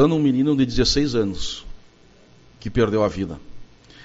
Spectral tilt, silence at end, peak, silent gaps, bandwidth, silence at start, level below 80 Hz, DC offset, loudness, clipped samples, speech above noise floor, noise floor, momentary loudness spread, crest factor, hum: -5.5 dB/octave; 0 s; -4 dBFS; none; 8 kHz; 0 s; -36 dBFS; under 0.1%; -21 LUFS; under 0.1%; 31 dB; -51 dBFS; 14 LU; 18 dB; none